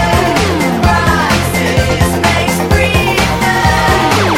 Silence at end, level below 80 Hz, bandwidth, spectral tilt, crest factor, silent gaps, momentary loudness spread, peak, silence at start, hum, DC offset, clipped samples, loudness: 0 s; -22 dBFS; 17 kHz; -4.5 dB/octave; 10 dB; none; 2 LU; 0 dBFS; 0 s; none; under 0.1%; under 0.1%; -11 LUFS